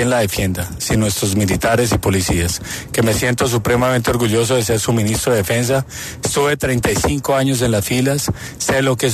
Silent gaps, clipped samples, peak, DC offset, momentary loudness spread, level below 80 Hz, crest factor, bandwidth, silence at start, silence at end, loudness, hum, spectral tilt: none; under 0.1%; -2 dBFS; under 0.1%; 5 LU; -34 dBFS; 14 dB; 14.5 kHz; 0 s; 0 s; -17 LUFS; none; -4.5 dB/octave